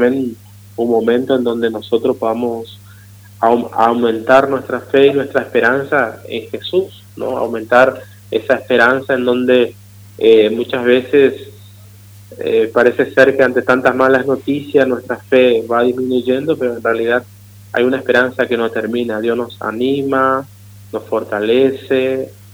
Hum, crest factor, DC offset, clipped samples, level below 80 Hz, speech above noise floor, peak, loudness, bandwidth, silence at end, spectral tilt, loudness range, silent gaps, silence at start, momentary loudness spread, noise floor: 50 Hz at -40 dBFS; 14 dB; under 0.1%; under 0.1%; -58 dBFS; 25 dB; 0 dBFS; -14 LUFS; over 20 kHz; 0.2 s; -6 dB/octave; 4 LU; none; 0 s; 10 LU; -39 dBFS